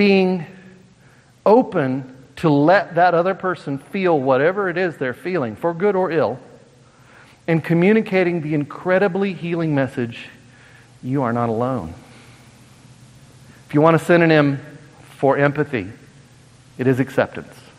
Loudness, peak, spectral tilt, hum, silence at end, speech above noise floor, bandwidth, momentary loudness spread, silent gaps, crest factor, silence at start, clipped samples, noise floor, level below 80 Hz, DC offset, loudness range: -19 LUFS; 0 dBFS; -7.5 dB/octave; none; 0.35 s; 33 dB; 13.5 kHz; 13 LU; none; 20 dB; 0 s; under 0.1%; -51 dBFS; -60 dBFS; under 0.1%; 6 LU